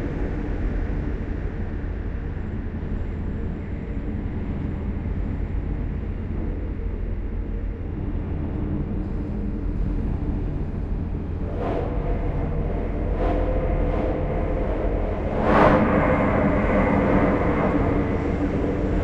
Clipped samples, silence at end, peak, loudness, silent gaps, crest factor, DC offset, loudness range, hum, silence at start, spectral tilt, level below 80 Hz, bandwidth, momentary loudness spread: under 0.1%; 0 s; -4 dBFS; -25 LUFS; none; 20 dB; under 0.1%; 10 LU; none; 0 s; -9.5 dB/octave; -28 dBFS; 5.8 kHz; 11 LU